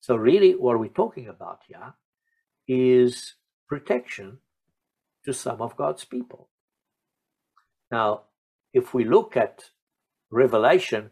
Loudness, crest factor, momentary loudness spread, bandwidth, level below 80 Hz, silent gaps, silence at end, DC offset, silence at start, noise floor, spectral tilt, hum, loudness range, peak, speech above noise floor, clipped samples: -23 LUFS; 20 dB; 21 LU; 12 kHz; -70 dBFS; 2.05-2.13 s, 3.53-3.67 s, 6.51-6.68 s, 7.87-7.91 s, 8.38-8.64 s, 9.82-9.87 s; 0.05 s; under 0.1%; 0.1 s; -84 dBFS; -6 dB/octave; none; 11 LU; -6 dBFS; 62 dB; under 0.1%